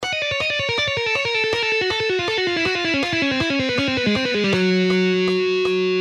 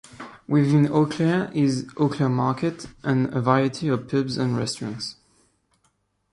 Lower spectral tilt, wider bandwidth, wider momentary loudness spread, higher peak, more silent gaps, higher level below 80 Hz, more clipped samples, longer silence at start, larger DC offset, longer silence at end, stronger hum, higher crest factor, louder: second, -4.5 dB/octave vs -7 dB/octave; about the same, 11 kHz vs 11.5 kHz; second, 2 LU vs 12 LU; second, -8 dBFS vs -4 dBFS; neither; first, -52 dBFS vs -60 dBFS; neither; second, 0 s vs 0.15 s; neither; second, 0 s vs 1.2 s; neither; second, 12 dB vs 18 dB; first, -19 LUFS vs -23 LUFS